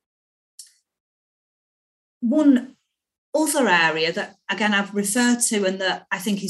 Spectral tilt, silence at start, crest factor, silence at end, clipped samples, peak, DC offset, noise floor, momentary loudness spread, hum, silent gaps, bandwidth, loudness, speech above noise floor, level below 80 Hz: -3 dB/octave; 0.6 s; 18 dB; 0 s; under 0.1%; -6 dBFS; under 0.1%; under -90 dBFS; 9 LU; none; 1.00-2.21 s, 3.18-3.33 s; 13.5 kHz; -20 LUFS; over 69 dB; -76 dBFS